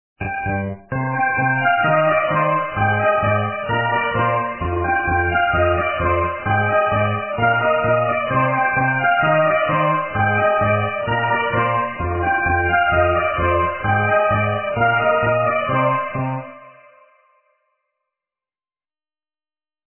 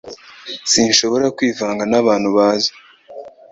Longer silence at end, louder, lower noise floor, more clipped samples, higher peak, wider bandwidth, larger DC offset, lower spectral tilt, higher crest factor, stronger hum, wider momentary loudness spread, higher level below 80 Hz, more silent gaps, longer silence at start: first, 3.25 s vs 0.2 s; second, -18 LUFS vs -15 LUFS; first, under -90 dBFS vs -36 dBFS; neither; second, -4 dBFS vs 0 dBFS; second, 3.2 kHz vs 8 kHz; neither; first, -10 dB/octave vs -2.5 dB/octave; about the same, 14 dB vs 18 dB; neither; second, 6 LU vs 23 LU; first, -36 dBFS vs -56 dBFS; neither; first, 0.2 s vs 0.05 s